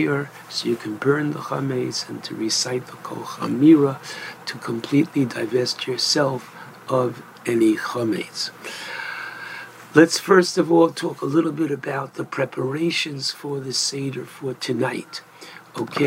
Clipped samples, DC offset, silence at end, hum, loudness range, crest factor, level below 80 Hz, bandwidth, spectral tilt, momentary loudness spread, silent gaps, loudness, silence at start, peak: under 0.1%; under 0.1%; 0 s; none; 5 LU; 22 dB; -72 dBFS; 16 kHz; -4.5 dB/octave; 16 LU; none; -22 LUFS; 0 s; 0 dBFS